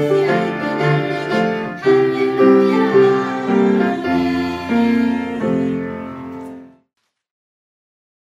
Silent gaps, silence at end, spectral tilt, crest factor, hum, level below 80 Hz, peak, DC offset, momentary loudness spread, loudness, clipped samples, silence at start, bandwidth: none; 1.55 s; -7.5 dB/octave; 16 dB; none; -54 dBFS; -2 dBFS; under 0.1%; 13 LU; -16 LUFS; under 0.1%; 0 s; 10 kHz